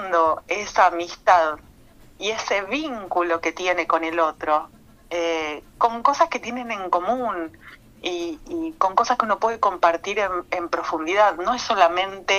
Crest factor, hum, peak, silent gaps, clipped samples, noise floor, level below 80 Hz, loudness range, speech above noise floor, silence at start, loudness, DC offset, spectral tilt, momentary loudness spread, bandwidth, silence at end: 22 dB; none; 0 dBFS; none; under 0.1%; -49 dBFS; -54 dBFS; 3 LU; 27 dB; 0 s; -22 LUFS; under 0.1%; -2.5 dB/octave; 11 LU; 15 kHz; 0 s